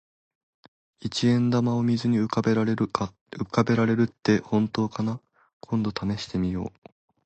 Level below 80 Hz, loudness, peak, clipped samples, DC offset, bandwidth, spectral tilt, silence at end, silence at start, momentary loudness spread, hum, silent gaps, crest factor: -54 dBFS; -25 LUFS; -6 dBFS; under 0.1%; under 0.1%; 8.6 kHz; -7 dB/octave; 0.55 s; 1.05 s; 10 LU; none; 3.21-3.26 s, 5.53-5.60 s; 20 dB